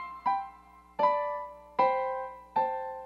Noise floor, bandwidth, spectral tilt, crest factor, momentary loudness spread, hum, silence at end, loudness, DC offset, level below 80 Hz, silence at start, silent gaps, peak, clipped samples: -54 dBFS; 6.6 kHz; -5.5 dB/octave; 20 dB; 11 LU; none; 0 s; -31 LUFS; under 0.1%; -64 dBFS; 0 s; none; -12 dBFS; under 0.1%